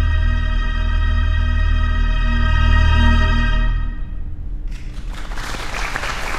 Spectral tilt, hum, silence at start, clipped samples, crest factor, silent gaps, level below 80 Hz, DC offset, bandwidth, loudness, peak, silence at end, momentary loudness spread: -5.5 dB/octave; none; 0 s; under 0.1%; 14 dB; none; -18 dBFS; under 0.1%; 9.6 kHz; -19 LUFS; -2 dBFS; 0 s; 16 LU